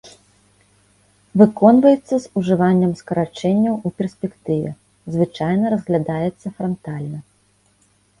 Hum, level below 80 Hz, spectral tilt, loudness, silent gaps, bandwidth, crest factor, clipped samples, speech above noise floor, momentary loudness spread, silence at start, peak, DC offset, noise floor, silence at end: 50 Hz at -45 dBFS; -56 dBFS; -8.5 dB/octave; -18 LUFS; none; 11.5 kHz; 18 dB; under 0.1%; 42 dB; 16 LU; 0.05 s; 0 dBFS; under 0.1%; -59 dBFS; 1 s